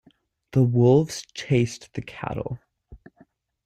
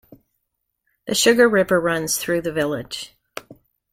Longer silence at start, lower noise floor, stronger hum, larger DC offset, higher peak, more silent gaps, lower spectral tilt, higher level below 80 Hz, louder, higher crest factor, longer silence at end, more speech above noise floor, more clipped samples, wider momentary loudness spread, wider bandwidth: second, 0.55 s vs 1.05 s; second, -60 dBFS vs -76 dBFS; neither; neither; second, -8 dBFS vs -2 dBFS; neither; first, -7 dB/octave vs -3 dB/octave; about the same, -54 dBFS vs -56 dBFS; second, -23 LUFS vs -19 LUFS; about the same, 18 dB vs 18 dB; first, 0.7 s vs 0.4 s; second, 38 dB vs 57 dB; neither; second, 17 LU vs 23 LU; second, 12 kHz vs 16.5 kHz